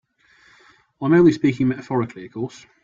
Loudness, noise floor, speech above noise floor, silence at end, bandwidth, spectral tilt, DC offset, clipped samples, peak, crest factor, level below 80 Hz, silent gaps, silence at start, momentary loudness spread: -20 LUFS; -56 dBFS; 37 dB; 0.35 s; 7.6 kHz; -8 dB/octave; under 0.1%; under 0.1%; -4 dBFS; 16 dB; -58 dBFS; none; 1 s; 16 LU